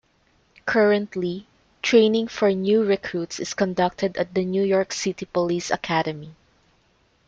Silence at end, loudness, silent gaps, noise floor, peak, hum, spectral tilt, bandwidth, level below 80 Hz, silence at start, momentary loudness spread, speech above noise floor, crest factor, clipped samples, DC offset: 0.95 s; -22 LUFS; none; -63 dBFS; -6 dBFS; none; -5 dB/octave; 8.8 kHz; -60 dBFS; 0.65 s; 10 LU; 41 dB; 18 dB; under 0.1%; under 0.1%